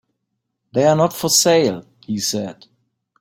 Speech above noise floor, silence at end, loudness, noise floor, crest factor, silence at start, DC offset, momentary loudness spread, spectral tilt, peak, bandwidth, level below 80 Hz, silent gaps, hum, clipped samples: 59 dB; 0.7 s; -17 LUFS; -76 dBFS; 18 dB; 0.75 s; under 0.1%; 15 LU; -3.5 dB/octave; -2 dBFS; 16.5 kHz; -60 dBFS; none; none; under 0.1%